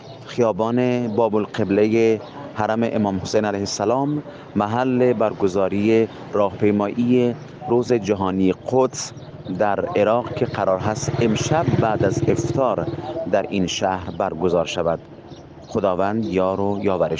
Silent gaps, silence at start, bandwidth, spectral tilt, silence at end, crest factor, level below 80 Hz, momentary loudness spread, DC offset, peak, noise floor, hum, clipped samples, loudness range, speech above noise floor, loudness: none; 0 s; 9.8 kHz; -6 dB/octave; 0 s; 16 dB; -52 dBFS; 8 LU; under 0.1%; -4 dBFS; -40 dBFS; none; under 0.1%; 3 LU; 20 dB; -21 LUFS